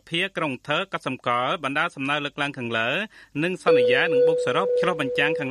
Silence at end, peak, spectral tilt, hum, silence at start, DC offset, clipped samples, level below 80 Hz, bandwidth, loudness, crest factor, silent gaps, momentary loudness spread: 0 s; -8 dBFS; -5 dB/octave; none; 0.1 s; under 0.1%; under 0.1%; -66 dBFS; 11.5 kHz; -23 LUFS; 16 dB; none; 9 LU